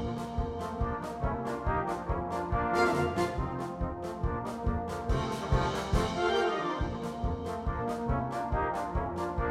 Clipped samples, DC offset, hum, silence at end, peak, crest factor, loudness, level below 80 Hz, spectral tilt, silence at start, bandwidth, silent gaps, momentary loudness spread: under 0.1%; under 0.1%; none; 0 s; -14 dBFS; 18 dB; -32 LUFS; -38 dBFS; -6.5 dB/octave; 0 s; 15 kHz; none; 7 LU